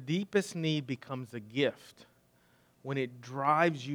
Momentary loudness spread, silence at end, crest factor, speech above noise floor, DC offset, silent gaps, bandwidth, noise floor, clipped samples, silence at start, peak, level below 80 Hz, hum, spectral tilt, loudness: 13 LU; 0 s; 22 dB; 34 dB; under 0.1%; none; 18.5 kHz; -67 dBFS; under 0.1%; 0 s; -12 dBFS; -80 dBFS; none; -5.5 dB/octave; -33 LUFS